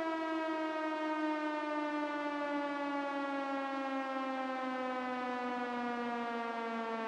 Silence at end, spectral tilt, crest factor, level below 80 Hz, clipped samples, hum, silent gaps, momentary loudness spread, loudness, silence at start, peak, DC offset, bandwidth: 0 s; -4.5 dB/octave; 14 dB; -86 dBFS; under 0.1%; none; none; 2 LU; -37 LUFS; 0 s; -24 dBFS; under 0.1%; 10.5 kHz